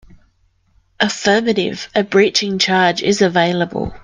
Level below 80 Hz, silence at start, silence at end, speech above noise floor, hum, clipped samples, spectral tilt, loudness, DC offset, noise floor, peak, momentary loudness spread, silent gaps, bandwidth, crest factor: -46 dBFS; 1 s; 0.05 s; 43 dB; none; under 0.1%; -4 dB/octave; -15 LUFS; under 0.1%; -59 dBFS; 0 dBFS; 6 LU; none; 10 kHz; 16 dB